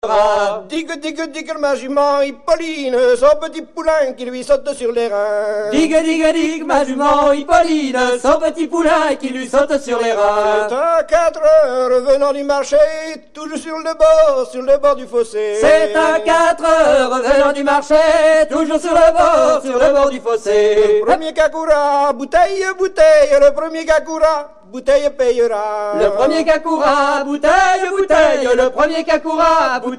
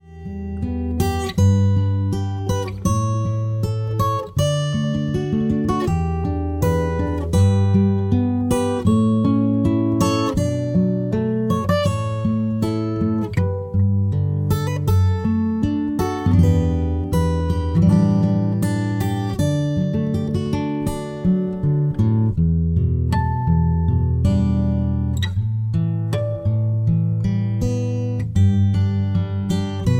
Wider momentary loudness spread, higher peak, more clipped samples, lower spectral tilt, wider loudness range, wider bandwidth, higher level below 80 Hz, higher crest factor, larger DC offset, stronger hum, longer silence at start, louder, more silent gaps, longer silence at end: about the same, 8 LU vs 6 LU; first, 0 dBFS vs -4 dBFS; neither; second, -3 dB/octave vs -7.5 dB/octave; about the same, 4 LU vs 3 LU; second, 11 kHz vs 16.5 kHz; second, -42 dBFS vs -32 dBFS; about the same, 14 dB vs 14 dB; first, 0.5% vs under 0.1%; neither; about the same, 0.05 s vs 0.05 s; first, -14 LUFS vs -20 LUFS; neither; about the same, 0 s vs 0 s